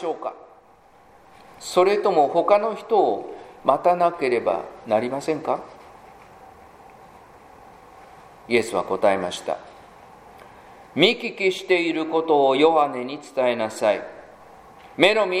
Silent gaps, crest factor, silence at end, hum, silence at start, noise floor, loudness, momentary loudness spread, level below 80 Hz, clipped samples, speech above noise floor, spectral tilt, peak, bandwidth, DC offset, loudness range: none; 22 dB; 0 s; none; 0 s; -53 dBFS; -21 LUFS; 13 LU; -64 dBFS; under 0.1%; 32 dB; -4.5 dB/octave; 0 dBFS; 15 kHz; under 0.1%; 9 LU